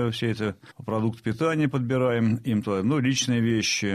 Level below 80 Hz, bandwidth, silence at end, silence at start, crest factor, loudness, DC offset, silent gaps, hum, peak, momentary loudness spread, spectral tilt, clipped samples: -60 dBFS; 14 kHz; 0 s; 0 s; 12 dB; -25 LUFS; under 0.1%; none; none; -12 dBFS; 6 LU; -5 dB/octave; under 0.1%